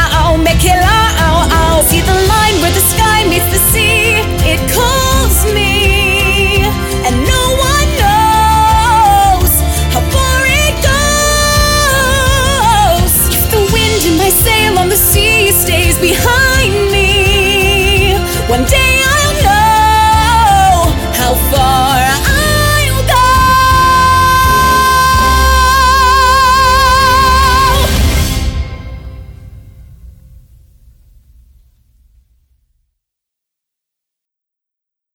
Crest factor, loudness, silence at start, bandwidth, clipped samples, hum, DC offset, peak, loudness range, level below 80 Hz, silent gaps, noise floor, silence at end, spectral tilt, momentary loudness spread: 10 dB; -9 LUFS; 0 s; over 20 kHz; under 0.1%; none; under 0.1%; 0 dBFS; 3 LU; -18 dBFS; none; -82 dBFS; 5.05 s; -3.5 dB/octave; 4 LU